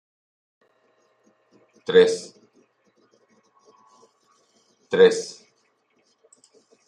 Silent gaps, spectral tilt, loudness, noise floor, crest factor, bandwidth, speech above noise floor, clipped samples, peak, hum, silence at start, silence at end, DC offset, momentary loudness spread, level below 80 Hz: none; -4 dB/octave; -19 LUFS; -67 dBFS; 24 dB; 10.5 kHz; 49 dB; under 0.1%; -2 dBFS; none; 1.9 s; 1.55 s; under 0.1%; 20 LU; -78 dBFS